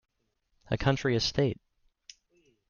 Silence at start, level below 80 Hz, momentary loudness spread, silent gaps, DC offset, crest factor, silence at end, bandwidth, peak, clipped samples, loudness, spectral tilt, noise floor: 0.7 s; -50 dBFS; 8 LU; none; under 0.1%; 22 dB; 1.15 s; 7.2 kHz; -10 dBFS; under 0.1%; -29 LUFS; -5.5 dB/octave; -75 dBFS